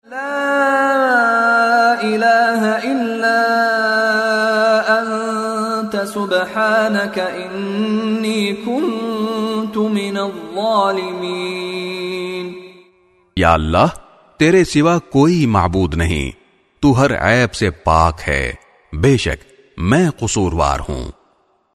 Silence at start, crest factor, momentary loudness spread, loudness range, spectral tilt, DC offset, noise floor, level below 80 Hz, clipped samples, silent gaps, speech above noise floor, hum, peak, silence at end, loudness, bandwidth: 0.1 s; 16 dB; 10 LU; 5 LU; -5.5 dB/octave; under 0.1%; -58 dBFS; -34 dBFS; under 0.1%; none; 43 dB; none; 0 dBFS; 0.65 s; -16 LUFS; 13.5 kHz